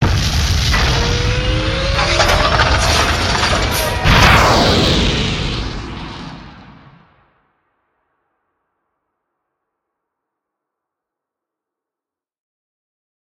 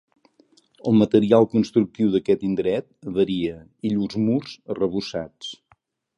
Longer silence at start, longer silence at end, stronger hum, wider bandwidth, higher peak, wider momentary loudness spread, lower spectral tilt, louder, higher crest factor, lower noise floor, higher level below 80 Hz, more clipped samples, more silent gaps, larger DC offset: second, 0 s vs 0.85 s; first, 6.5 s vs 0.65 s; neither; first, 16.5 kHz vs 8.4 kHz; first, 0 dBFS vs -4 dBFS; about the same, 15 LU vs 14 LU; second, -4 dB/octave vs -7.5 dB/octave; first, -13 LUFS vs -22 LUFS; about the same, 18 dB vs 20 dB; first, -88 dBFS vs -62 dBFS; first, -24 dBFS vs -56 dBFS; neither; neither; neither